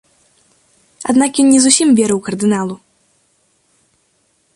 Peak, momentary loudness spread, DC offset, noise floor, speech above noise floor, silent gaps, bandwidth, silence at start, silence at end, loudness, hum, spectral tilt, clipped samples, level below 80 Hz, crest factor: 0 dBFS; 16 LU; under 0.1%; -60 dBFS; 48 dB; none; 11.5 kHz; 1 s; 1.8 s; -13 LUFS; none; -3.5 dB/octave; under 0.1%; -58 dBFS; 16 dB